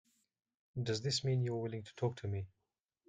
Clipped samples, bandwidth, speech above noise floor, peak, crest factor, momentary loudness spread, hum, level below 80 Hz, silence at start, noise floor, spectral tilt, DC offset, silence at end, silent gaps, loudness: under 0.1%; 9.4 kHz; 51 dB; -22 dBFS; 18 dB; 10 LU; none; -72 dBFS; 0.75 s; -88 dBFS; -5.5 dB/octave; under 0.1%; 0.6 s; none; -38 LUFS